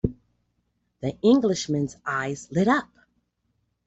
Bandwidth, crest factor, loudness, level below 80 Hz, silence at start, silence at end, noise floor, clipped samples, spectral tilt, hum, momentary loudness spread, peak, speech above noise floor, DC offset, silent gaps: 8.2 kHz; 18 dB; -24 LUFS; -50 dBFS; 0.05 s; 1 s; -73 dBFS; under 0.1%; -5.5 dB/octave; 60 Hz at -50 dBFS; 11 LU; -8 dBFS; 50 dB; under 0.1%; none